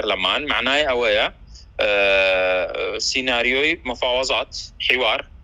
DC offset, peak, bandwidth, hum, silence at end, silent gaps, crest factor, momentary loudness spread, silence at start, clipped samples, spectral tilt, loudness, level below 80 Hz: under 0.1%; 0 dBFS; 11.5 kHz; none; 0 s; none; 20 dB; 7 LU; 0 s; under 0.1%; -2 dB/octave; -19 LUFS; -44 dBFS